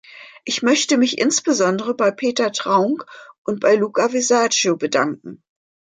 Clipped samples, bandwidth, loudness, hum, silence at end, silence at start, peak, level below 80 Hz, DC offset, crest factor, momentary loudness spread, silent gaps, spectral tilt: under 0.1%; 9.6 kHz; -18 LUFS; none; 0.6 s; 0.15 s; -4 dBFS; -70 dBFS; under 0.1%; 16 dB; 9 LU; 3.38-3.45 s; -3 dB/octave